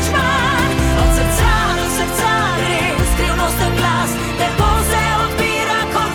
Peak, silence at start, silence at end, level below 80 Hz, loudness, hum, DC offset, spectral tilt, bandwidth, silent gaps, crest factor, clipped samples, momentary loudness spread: -2 dBFS; 0 s; 0 s; -22 dBFS; -15 LUFS; none; under 0.1%; -4 dB/octave; 19 kHz; none; 14 dB; under 0.1%; 2 LU